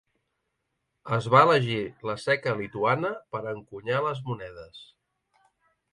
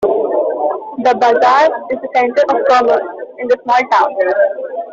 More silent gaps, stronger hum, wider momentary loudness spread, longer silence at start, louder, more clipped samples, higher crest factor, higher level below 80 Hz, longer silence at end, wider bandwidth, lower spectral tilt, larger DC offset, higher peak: neither; neither; first, 17 LU vs 8 LU; first, 1.05 s vs 0 s; second, -26 LUFS vs -13 LUFS; neither; first, 22 dB vs 12 dB; about the same, -64 dBFS vs -60 dBFS; first, 1.1 s vs 0 s; first, 11.5 kHz vs 7.6 kHz; first, -6.5 dB/octave vs -4 dB/octave; neither; second, -6 dBFS vs -2 dBFS